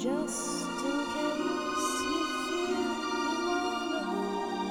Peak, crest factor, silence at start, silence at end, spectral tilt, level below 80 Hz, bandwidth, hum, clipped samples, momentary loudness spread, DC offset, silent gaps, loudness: -18 dBFS; 14 dB; 0 s; 0 s; -3 dB/octave; -62 dBFS; 19 kHz; none; under 0.1%; 2 LU; under 0.1%; none; -31 LUFS